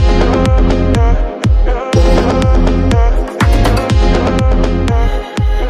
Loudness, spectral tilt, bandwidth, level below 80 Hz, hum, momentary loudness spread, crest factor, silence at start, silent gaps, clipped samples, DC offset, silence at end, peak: -13 LUFS; -7 dB/octave; 11.5 kHz; -12 dBFS; none; 4 LU; 10 dB; 0 s; none; under 0.1%; under 0.1%; 0 s; 0 dBFS